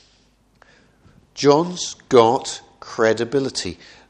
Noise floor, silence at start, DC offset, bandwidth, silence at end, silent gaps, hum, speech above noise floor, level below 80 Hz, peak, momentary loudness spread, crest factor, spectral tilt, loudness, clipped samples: -58 dBFS; 1.35 s; under 0.1%; 10 kHz; 0.35 s; none; none; 39 dB; -58 dBFS; 0 dBFS; 17 LU; 20 dB; -4.5 dB/octave; -19 LUFS; under 0.1%